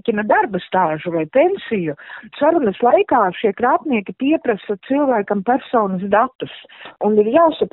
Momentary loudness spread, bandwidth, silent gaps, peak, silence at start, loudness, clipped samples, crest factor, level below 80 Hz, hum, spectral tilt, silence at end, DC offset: 8 LU; 4.1 kHz; 6.35-6.39 s; -2 dBFS; 0.05 s; -17 LUFS; under 0.1%; 16 dB; -58 dBFS; none; -4.5 dB/octave; 0.05 s; under 0.1%